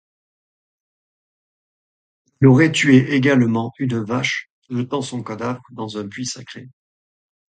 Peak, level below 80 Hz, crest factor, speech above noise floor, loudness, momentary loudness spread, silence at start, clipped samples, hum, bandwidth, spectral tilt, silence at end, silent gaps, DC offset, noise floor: 0 dBFS; -58 dBFS; 20 dB; over 72 dB; -18 LUFS; 16 LU; 2.4 s; under 0.1%; none; 9.4 kHz; -6 dB/octave; 0.9 s; 4.50-4.62 s; under 0.1%; under -90 dBFS